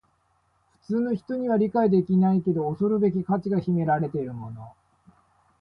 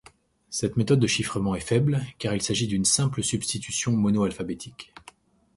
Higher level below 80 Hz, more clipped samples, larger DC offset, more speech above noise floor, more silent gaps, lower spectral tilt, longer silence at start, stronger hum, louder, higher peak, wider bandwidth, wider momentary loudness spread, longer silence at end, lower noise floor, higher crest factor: second, -62 dBFS vs -52 dBFS; neither; neither; first, 44 dB vs 31 dB; neither; first, -11 dB/octave vs -4.5 dB/octave; first, 0.9 s vs 0.5 s; neither; about the same, -24 LUFS vs -25 LUFS; about the same, -10 dBFS vs -8 dBFS; second, 5.2 kHz vs 11.5 kHz; about the same, 11 LU vs 12 LU; first, 0.9 s vs 0.75 s; first, -68 dBFS vs -56 dBFS; about the same, 14 dB vs 18 dB